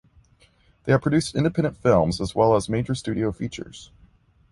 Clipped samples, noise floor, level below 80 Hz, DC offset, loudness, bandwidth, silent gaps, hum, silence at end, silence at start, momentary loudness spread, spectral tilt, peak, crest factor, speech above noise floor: under 0.1%; -59 dBFS; -46 dBFS; under 0.1%; -23 LUFS; 11.5 kHz; none; none; 0.65 s; 0.85 s; 15 LU; -6.5 dB/octave; -4 dBFS; 18 dB; 37 dB